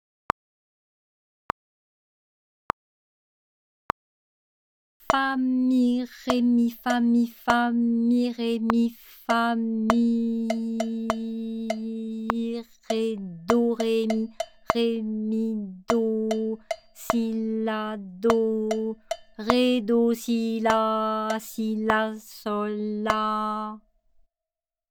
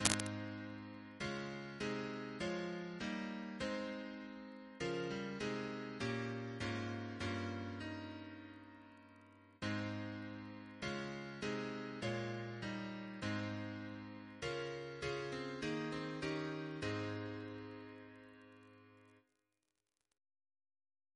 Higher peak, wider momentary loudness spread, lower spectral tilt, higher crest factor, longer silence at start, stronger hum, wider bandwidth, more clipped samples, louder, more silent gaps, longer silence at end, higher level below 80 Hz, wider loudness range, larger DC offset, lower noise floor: first, 0 dBFS vs -8 dBFS; about the same, 11 LU vs 13 LU; about the same, -5.5 dB/octave vs -4.5 dB/octave; second, 26 dB vs 38 dB; first, 5.1 s vs 0 s; neither; first, 18.5 kHz vs 11 kHz; neither; first, -26 LUFS vs -44 LUFS; neither; second, 1.1 s vs 1.95 s; first, -58 dBFS vs -70 dBFS; first, 10 LU vs 5 LU; neither; about the same, under -90 dBFS vs -89 dBFS